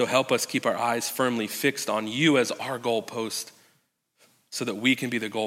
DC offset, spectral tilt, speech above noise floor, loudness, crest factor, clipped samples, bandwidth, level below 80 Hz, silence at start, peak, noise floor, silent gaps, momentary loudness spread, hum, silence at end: under 0.1%; -3.5 dB/octave; 44 dB; -26 LUFS; 20 dB; under 0.1%; 16.5 kHz; -80 dBFS; 0 s; -6 dBFS; -70 dBFS; none; 9 LU; none; 0 s